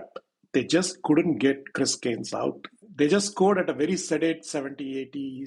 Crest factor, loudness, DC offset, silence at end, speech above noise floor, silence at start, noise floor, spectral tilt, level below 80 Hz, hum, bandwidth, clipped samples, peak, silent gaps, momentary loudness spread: 16 dB; -26 LUFS; under 0.1%; 0 s; 22 dB; 0 s; -47 dBFS; -4.5 dB/octave; -68 dBFS; none; 11.5 kHz; under 0.1%; -10 dBFS; none; 11 LU